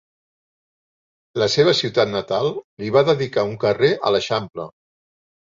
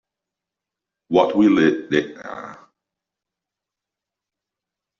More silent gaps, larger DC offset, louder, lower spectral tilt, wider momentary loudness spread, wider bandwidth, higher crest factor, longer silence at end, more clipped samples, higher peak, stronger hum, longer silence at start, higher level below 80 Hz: first, 2.64-2.77 s vs none; neither; about the same, -19 LUFS vs -18 LUFS; about the same, -5 dB/octave vs -4.5 dB/octave; second, 14 LU vs 19 LU; about the same, 7.6 kHz vs 7.2 kHz; about the same, 18 dB vs 20 dB; second, 0.75 s vs 2.45 s; neither; about the same, -4 dBFS vs -2 dBFS; neither; first, 1.35 s vs 1.1 s; about the same, -58 dBFS vs -62 dBFS